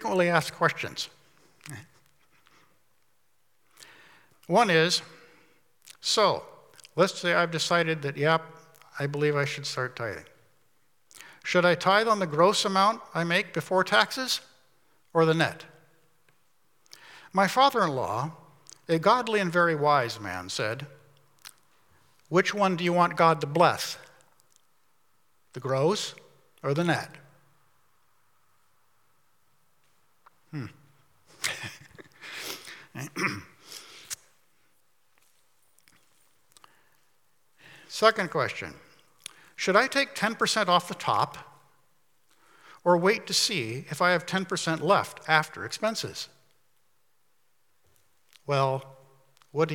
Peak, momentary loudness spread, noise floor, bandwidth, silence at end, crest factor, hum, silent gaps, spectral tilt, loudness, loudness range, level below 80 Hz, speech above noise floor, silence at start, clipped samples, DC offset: -4 dBFS; 19 LU; -73 dBFS; 18 kHz; 0 s; 24 dB; none; none; -4 dB/octave; -26 LUFS; 13 LU; -78 dBFS; 48 dB; 0 s; under 0.1%; under 0.1%